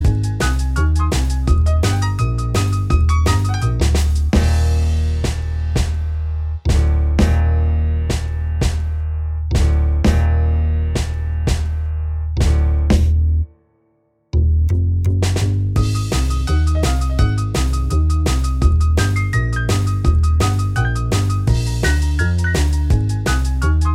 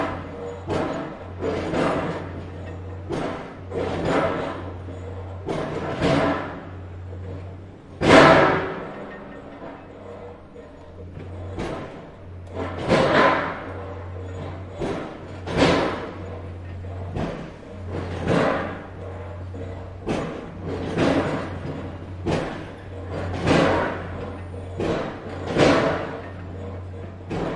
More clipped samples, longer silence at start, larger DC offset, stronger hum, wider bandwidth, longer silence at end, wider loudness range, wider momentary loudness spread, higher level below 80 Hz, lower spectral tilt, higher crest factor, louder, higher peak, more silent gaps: neither; about the same, 0 s vs 0 s; neither; neither; first, 13 kHz vs 11 kHz; about the same, 0 s vs 0 s; second, 2 LU vs 8 LU; second, 6 LU vs 19 LU; first, -18 dBFS vs -46 dBFS; about the same, -6 dB/octave vs -6 dB/octave; second, 14 dB vs 24 dB; first, -18 LUFS vs -24 LUFS; about the same, -2 dBFS vs 0 dBFS; neither